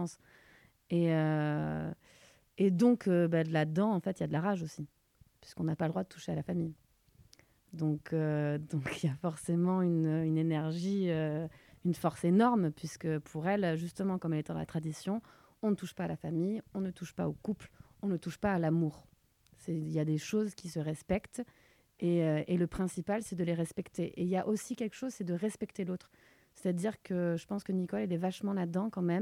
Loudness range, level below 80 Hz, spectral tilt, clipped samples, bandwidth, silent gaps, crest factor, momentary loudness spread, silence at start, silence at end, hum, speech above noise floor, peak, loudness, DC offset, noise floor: 6 LU; -64 dBFS; -7.5 dB/octave; under 0.1%; 15 kHz; none; 18 dB; 10 LU; 0 s; 0 s; none; 33 dB; -16 dBFS; -34 LUFS; under 0.1%; -66 dBFS